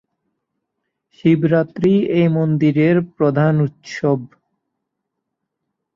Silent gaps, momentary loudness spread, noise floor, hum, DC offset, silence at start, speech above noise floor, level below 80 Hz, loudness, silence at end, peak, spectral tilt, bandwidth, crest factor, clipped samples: none; 6 LU; -78 dBFS; none; under 0.1%; 1.25 s; 62 dB; -58 dBFS; -17 LUFS; 1.7 s; -2 dBFS; -9 dB/octave; 7.2 kHz; 16 dB; under 0.1%